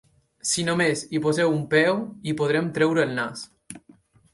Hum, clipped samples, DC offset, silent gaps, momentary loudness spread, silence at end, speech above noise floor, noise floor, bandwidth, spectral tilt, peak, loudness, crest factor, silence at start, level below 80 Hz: none; under 0.1%; under 0.1%; none; 19 LU; 0.55 s; 33 dB; -56 dBFS; 11.5 kHz; -4.5 dB/octave; -6 dBFS; -23 LUFS; 18 dB; 0.45 s; -64 dBFS